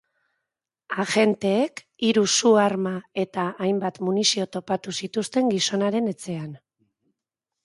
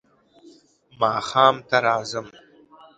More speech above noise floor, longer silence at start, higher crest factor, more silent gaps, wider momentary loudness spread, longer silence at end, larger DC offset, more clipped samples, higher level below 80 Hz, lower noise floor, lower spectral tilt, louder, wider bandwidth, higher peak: first, 63 dB vs 33 dB; about the same, 0.9 s vs 1 s; about the same, 18 dB vs 22 dB; neither; about the same, 10 LU vs 11 LU; first, 1.1 s vs 0.7 s; neither; neither; second, -70 dBFS vs -64 dBFS; first, -86 dBFS vs -54 dBFS; about the same, -4 dB/octave vs -3.5 dB/octave; about the same, -23 LUFS vs -21 LUFS; first, 11.5 kHz vs 9.2 kHz; second, -6 dBFS vs -2 dBFS